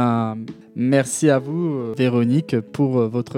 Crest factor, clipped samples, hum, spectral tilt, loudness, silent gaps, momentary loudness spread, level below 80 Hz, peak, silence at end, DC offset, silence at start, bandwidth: 16 dB; under 0.1%; none; -6.5 dB/octave; -20 LUFS; none; 7 LU; -66 dBFS; -4 dBFS; 0 s; under 0.1%; 0 s; 15 kHz